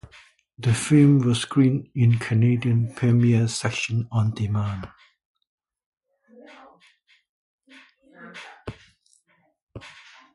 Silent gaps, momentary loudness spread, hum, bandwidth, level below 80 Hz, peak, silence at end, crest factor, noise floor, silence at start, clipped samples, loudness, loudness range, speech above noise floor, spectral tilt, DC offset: 5.25-5.35 s, 5.47-5.58 s, 5.86-5.92 s, 7.29-7.58 s, 9.62-9.67 s; 24 LU; none; 11.5 kHz; -52 dBFS; -6 dBFS; 0.45 s; 18 dB; -65 dBFS; 0.6 s; under 0.1%; -21 LUFS; 23 LU; 45 dB; -6.5 dB/octave; under 0.1%